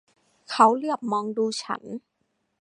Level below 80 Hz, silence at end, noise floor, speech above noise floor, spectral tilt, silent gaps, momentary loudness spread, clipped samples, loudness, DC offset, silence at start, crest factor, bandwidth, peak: -80 dBFS; 0.65 s; -74 dBFS; 51 dB; -4 dB/octave; none; 16 LU; under 0.1%; -24 LUFS; under 0.1%; 0.5 s; 22 dB; 11 kHz; -4 dBFS